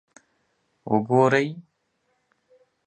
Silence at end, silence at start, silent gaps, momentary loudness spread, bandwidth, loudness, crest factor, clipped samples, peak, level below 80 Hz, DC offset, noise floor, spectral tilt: 1.25 s; 0.85 s; none; 24 LU; 8.8 kHz; -22 LUFS; 22 dB; under 0.1%; -6 dBFS; -70 dBFS; under 0.1%; -72 dBFS; -7 dB/octave